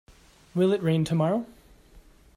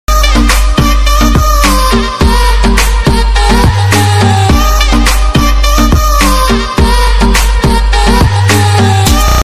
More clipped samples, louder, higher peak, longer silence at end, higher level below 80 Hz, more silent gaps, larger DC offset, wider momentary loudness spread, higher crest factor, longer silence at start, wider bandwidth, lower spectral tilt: second, under 0.1% vs 0.6%; second, -26 LUFS vs -8 LUFS; second, -12 dBFS vs 0 dBFS; first, 0.35 s vs 0 s; second, -58 dBFS vs -10 dBFS; neither; neither; first, 10 LU vs 2 LU; first, 16 dB vs 6 dB; first, 0.55 s vs 0.1 s; second, 12.5 kHz vs 15.5 kHz; first, -7.5 dB/octave vs -4.5 dB/octave